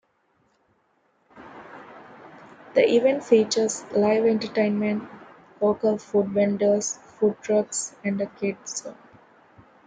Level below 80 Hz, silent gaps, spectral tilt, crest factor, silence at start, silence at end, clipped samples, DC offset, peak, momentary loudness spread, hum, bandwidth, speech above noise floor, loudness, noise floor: -68 dBFS; none; -4.5 dB/octave; 20 dB; 1.35 s; 0.95 s; under 0.1%; under 0.1%; -6 dBFS; 23 LU; none; 9.6 kHz; 45 dB; -23 LUFS; -67 dBFS